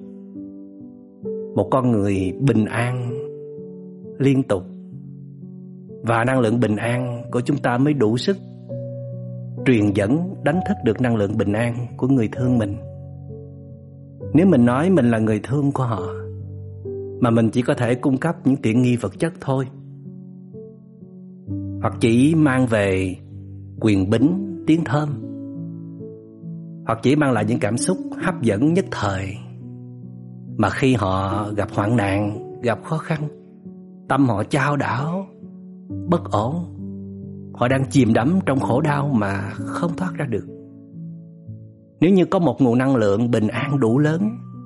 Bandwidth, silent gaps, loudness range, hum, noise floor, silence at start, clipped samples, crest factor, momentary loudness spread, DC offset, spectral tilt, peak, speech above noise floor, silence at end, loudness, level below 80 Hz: 11.5 kHz; none; 4 LU; none; -41 dBFS; 0 s; under 0.1%; 16 dB; 21 LU; under 0.1%; -7 dB/octave; -4 dBFS; 23 dB; 0 s; -20 LUFS; -56 dBFS